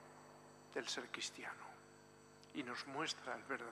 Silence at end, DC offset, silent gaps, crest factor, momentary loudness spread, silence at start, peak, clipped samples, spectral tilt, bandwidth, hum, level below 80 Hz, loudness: 0 s; under 0.1%; none; 22 dB; 19 LU; 0 s; -28 dBFS; under 0.1%; -2 dB/octave; 14.5 kHz; 50 Hz at -70 dBFS; -88 dBFS; -46 LUFS